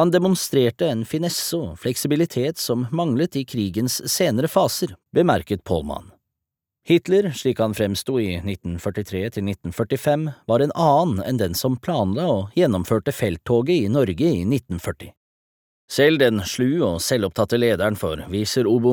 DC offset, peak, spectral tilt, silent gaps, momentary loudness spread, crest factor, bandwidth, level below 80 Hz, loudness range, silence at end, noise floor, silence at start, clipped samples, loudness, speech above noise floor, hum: under 0.1%; -2 dBFS; -5.5 dB/octave; 15.17-15.88 s; 9 LU; 18 dB; over 20 kHz; -48 dBFS; 2 LU; 0 s; -84 dBFS; 0 s; under 0.1%; -21 LUFS; 64 dB; none